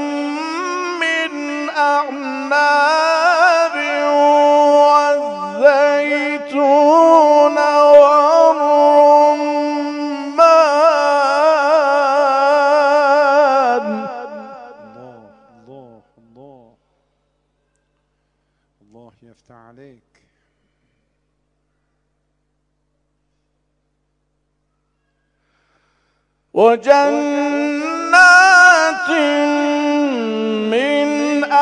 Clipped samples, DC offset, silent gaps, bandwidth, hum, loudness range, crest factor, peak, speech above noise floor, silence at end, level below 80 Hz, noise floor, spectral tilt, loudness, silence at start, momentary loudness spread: 0.1%; under 0.1%; none; 10 kHz; 50 Hz at -70 dBFS; 7 LU; 14 dB; 0 dBFS; 55 dB; 0 s; -66 dBFS; -68 dBFS; -3 dB/octave; -13 LUFS; 0 s; 12 LU